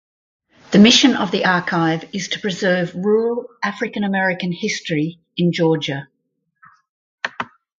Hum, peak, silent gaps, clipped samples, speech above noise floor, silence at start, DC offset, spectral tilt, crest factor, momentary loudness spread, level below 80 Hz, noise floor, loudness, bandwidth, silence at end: none; 0 dBFS; 6.89-7.18 s; under 0.1%; 55 dB; 0.7 s; under 0.1%; -4.5 dB/octave; 18 dB; 13 LU; -60 dBFS; -72 dBFS; -18 LUFS; 7.6 kHz; 0.35 s